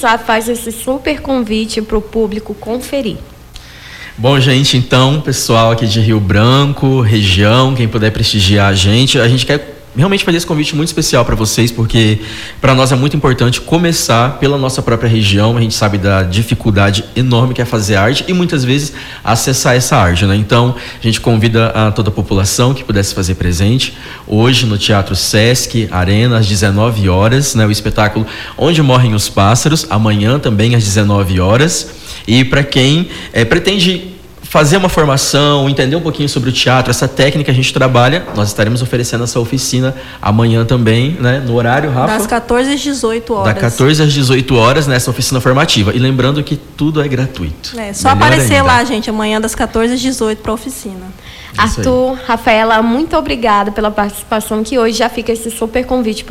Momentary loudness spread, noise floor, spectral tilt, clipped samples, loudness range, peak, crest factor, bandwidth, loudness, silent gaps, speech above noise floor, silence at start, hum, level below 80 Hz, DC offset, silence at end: 8 LU; -33 dBFS; -5 dB/octave; under 0.1%; 3 LU; 0 dBFS; 10 dB; 16 kHz; -11 LUFS; none; 22 dB; 0 s; none; -32 dBFS; under 0.1%; 0 s